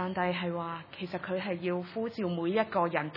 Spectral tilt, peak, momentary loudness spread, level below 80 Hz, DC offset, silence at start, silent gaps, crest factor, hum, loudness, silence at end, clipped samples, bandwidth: -9 dB/octave; -12 dBFS; 9 LU; -72 dBFS; under 0.1%; 0 s; none; 20 dB; none; -33 LUFS; 0 s; under 0.1%; 5.8 kHz